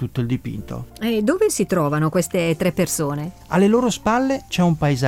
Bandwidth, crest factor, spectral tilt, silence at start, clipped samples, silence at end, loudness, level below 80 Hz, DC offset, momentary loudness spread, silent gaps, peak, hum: 17 kHz; 14 dB; -5.5 dB/octave; 0 s; under 0.1%; 0 s; -20 LUFS; -44 dBFS; under 0.1%; 9 LU; none; -6 dBFS; none